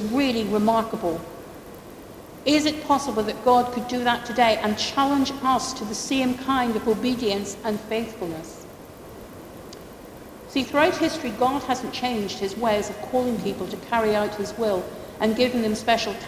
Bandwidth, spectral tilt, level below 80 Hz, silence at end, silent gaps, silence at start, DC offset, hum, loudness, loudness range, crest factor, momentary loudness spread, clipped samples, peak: 16 kHz; -4 dB/octave; -52 dBFS; 0 s; none; 0 s; under 0.1%; none; -24 LUFS; 6 LU; 20 dB; 20 LU; under 0.1%; -4 dBFS